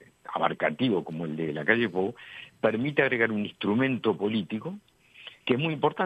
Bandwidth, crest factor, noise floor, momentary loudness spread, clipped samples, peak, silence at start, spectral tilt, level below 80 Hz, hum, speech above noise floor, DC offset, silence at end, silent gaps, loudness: 8.4 kHz; 22 dB; -50 dBFS; 14 LU; under 0.1%; -6 dBFS; 0.3 s; -7.5 dB/octave; -70 dBFS; none; 23 dB; under 0.1%; 0 s; none; -27 LUFS